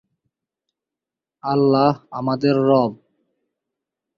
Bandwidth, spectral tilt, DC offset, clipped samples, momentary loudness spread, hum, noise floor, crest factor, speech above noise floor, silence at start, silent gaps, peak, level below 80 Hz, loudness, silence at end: 6 kHz; -9 dB/octave; under 0.1%; under 0.1%; 9 LU; none; -88 dBFS; 20 dB; 70 dB; 1.45 s; none; -2 dBFS; -62 dBFS; -19 LUFS; 1.25 s